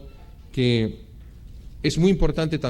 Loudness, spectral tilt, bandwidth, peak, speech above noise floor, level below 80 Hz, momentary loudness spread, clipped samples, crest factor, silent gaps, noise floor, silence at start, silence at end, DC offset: -23 LUFS; -6.5 dB/octave; 13 kHz; -6 dBFS; 22 dB; -32 dBFS; 17 LU; under 0.1%; 18 dB; none; -43 dBFS; 0 s; 0 s; under 0.1%